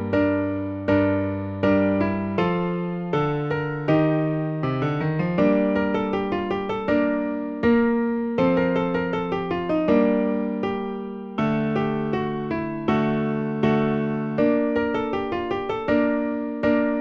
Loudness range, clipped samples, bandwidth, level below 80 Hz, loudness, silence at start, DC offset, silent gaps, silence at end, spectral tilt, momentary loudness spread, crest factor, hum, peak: 2 LU; under 0.1%; 6.4 kHz; -50 dBFS; -23 LUFS; 0 s; under 0.1%; none; 0 s; -9 dB/octave; 6 LU; 16 dB; none; -6 dBFS